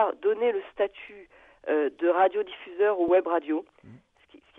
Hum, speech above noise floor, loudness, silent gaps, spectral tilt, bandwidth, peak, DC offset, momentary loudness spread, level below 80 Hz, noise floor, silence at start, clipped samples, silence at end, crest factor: none; 31 dB; -26 LUFS; none; -7 dB/octave; 3.9 kHz; -10 dBFS; under 0.1%; 12 LU; -70 dBFS; -57 dBFS; 0 s; under 0.1%; 0.6 s; 16 dB